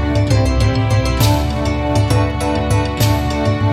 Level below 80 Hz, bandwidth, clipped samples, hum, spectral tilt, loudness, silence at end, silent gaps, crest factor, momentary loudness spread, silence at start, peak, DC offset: -22 dBFS; 15.5 kHz; under 0.1%; none; -6 dB/octave; -16 LUFS; 0 s; none; 14 dB; 3 LU; 0 s; 0 dBFS; under 0.1%